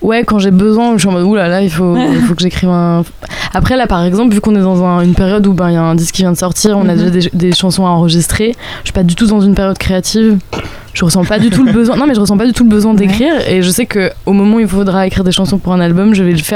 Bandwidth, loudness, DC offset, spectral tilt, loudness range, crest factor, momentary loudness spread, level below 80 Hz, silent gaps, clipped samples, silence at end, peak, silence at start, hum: 16 kHz; -10 LUFS; under 0.1%; -5.5 dB/octave; 2 LU; 10 dB; 5 LU; -28 dBFS; none; under 0.1%; 0 s; 0 dBFS; 0 s; none